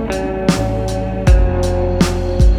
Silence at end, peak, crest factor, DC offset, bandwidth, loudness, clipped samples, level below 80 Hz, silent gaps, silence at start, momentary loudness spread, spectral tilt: 0 s; 0 dBFS; 14 dB; under 0.1%; 13 kHz; -16 LUFS; under 0.1%; -16 dBFS; none; 0 s; 6 LU; -6.5 dB/octave